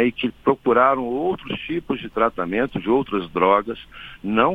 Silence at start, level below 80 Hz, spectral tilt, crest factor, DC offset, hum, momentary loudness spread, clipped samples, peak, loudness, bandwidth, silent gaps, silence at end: 0 s; -50 dBFS; -8 dB/octave; 18 dB; under 0.1%; none; 11 LU; under 0.1%; -2 dBFS; -21 LUFS; 4.9 kHz; none; 0 s